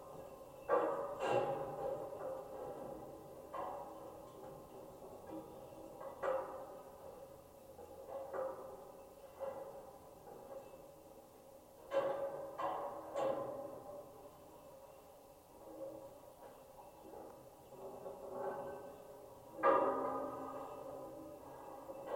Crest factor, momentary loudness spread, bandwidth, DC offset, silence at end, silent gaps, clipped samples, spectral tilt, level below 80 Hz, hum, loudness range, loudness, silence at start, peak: 24 dB; 20 LU; 16.5 kHz; under 0.1%; 0 s; none; under 0.1%; -5.5 dB/octave; -74 dBFS; none; 13 LU; -44 LUFS; 0 s; -20 dBFS